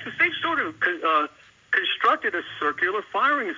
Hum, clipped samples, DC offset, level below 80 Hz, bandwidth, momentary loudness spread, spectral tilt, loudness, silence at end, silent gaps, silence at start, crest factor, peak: none; under 0.1%; under 0.1%; -68 dBFS; 7.6 kHz; 5 LU; -4 dB/octave; -23 LUFS; 0 s; none; 0 s; 16 dB; -8 dBFS